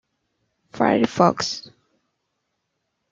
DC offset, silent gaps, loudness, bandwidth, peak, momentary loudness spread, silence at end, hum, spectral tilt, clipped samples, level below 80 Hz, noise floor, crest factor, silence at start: under 0.1%; none; -20 LUFS; 7.6 kHz; -2 dBFS; 9 LU; 1.5 s; none; -5 dB/octave; under 0.1%; -64 dBFS; -76 dBFS; 24 dB; 0.75 s